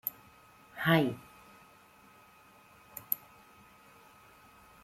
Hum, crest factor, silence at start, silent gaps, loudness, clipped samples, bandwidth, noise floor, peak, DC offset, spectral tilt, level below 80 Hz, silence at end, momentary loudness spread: none; 26 dB; 0.05 s; none; -31 LUFS; under 0.1%; 16 kHz; -60 dBFS; -12 dBFS; under 0.1%; -6 dB/octave; -72 dBFS; 1.65 s; 30 LU